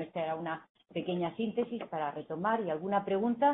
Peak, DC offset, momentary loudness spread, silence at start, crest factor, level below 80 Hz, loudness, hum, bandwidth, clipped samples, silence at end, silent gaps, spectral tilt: -16 dBFS; under 0.1%; 8 LU; 0 s; 18 dB; -74 dBFS; -34 LUFS; none; 4 kHz; under 0.1%; 0 s; 0.69-0.75 s; -10 dB/octave